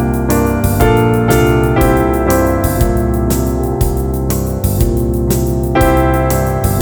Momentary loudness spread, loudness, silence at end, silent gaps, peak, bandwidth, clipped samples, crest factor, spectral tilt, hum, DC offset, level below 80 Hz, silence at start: 5 LU; -13 LUFS; 0 s; none; 0 dBFS; over 20 kHz; under 0.1%; 12 dB; -6.5 dB/octave; none; under 0.1%; -18 dBFS; 0 s